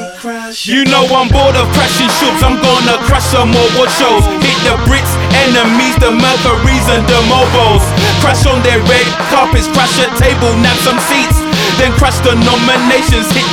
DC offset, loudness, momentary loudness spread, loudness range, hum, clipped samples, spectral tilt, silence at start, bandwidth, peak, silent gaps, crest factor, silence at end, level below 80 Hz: under 0.1%; -9 LUFS; 2 LU; 1 LU; none; 0.1%; -4.5 dB/octave; 0 s; 18.5 kHz; 0 dBFS; none; 8 dB; 0 s; -20 dBFS